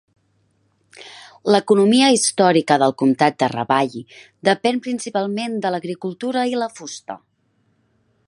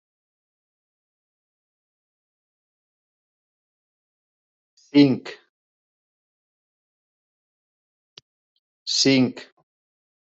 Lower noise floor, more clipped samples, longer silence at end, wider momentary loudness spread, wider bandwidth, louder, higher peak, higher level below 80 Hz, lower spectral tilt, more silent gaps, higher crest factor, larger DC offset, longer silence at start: second, -64 dBFS vs under -90 dBFS; neither; first, 1.1 s vs 0.85 s; about the same, 18 LU vs 20 LU; first, 11.5 kHz vs 8 kHz; about the same, -18 LUFS vs -20 LUFS; first, 0 dBFS vs -4 dBFS; about the same, -68 dBFS vs -70 dBFS; about the same, -4 dB/octave vs -4.5 dB/octave; second, none vs 5.49-8.16 s, 8.22-8.86 s; second, 20 dB vs 26 dB; neither; second, 0.95 s vs 4.95 s